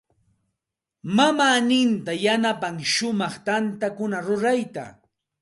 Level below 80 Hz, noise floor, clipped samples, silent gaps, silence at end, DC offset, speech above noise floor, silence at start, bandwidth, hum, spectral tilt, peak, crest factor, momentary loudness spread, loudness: -68 dBFS; -85 dBFS; under 0.1%; none; 0.5 s; under 0.1%; 63 dB; 1.05 s; 11.5 kHz; none; -4 dB/octave; -4 dBFS; 20 dB; 10 LU; -22 LUFS